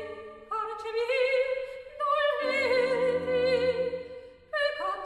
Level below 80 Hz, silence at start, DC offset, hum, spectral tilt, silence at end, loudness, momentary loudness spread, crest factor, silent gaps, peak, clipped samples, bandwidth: -62 dBFS; 0 s; under 0.1%; none; -4 dB/octave; 0 s; -28 LUFS; 14 LU; 14 dB; none; -16 dBFS; under 0.1%; 10.5 kHz